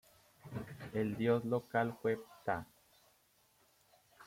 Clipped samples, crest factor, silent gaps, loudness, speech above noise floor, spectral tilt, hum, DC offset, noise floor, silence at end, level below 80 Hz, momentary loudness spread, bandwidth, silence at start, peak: under 0.1%; 20 dB; none; -38 LUFS; 36 dB; -7.5 dB/octave; none; under 0.1%; -72 dBFS; 0 s; -72 dBFS; 14 LU; 16.5 kHz; 0.45 s; -18 dBFS